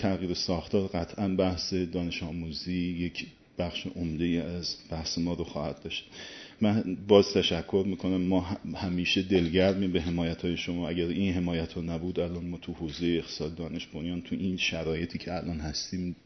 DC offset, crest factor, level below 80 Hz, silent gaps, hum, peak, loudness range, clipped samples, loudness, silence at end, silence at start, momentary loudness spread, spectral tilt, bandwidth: under 0.1%; 24 dB; -50 dBFS; none; none; -6 dBFS; 6 LU; under 0.1%; -30 LUFS; 0.1 s; 0 s; 10 LU; -5.5 dB/octave; 6.4 kHz